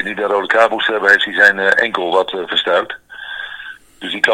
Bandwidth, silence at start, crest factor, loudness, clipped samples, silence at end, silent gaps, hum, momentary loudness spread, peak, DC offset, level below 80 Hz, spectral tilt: 16.5 kHz; 0 s; 16 dB; -13 LUFS; 0.2%; 0 s; none; none; 18 LU; 0 dBFS; under 0.1%; -58 dBFS; -2.5 dB/octave